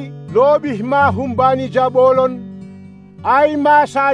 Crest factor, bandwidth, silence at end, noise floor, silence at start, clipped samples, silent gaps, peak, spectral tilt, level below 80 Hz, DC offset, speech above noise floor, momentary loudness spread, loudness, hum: 12 dB; 10 kHz; 0 s; -37 dBFS; 0 s; under 0.1%; none; -2 dBFS; -7 dB/octave; -54 dBFS; 0.1%; 24 dB; 10 LU; -14 LUFS; none